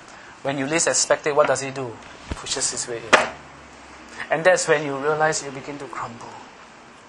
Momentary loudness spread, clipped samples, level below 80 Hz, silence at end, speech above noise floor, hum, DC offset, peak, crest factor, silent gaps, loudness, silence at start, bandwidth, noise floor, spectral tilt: 22 LU; under 0.1%; -50 dBFS; 0 s; 23 dB; none; under 0.1%; 0 dBFS; 24 dB; none; -21 LUFS; 0 s; 11 kHz; -45 dBFS; -2.5 dB/octave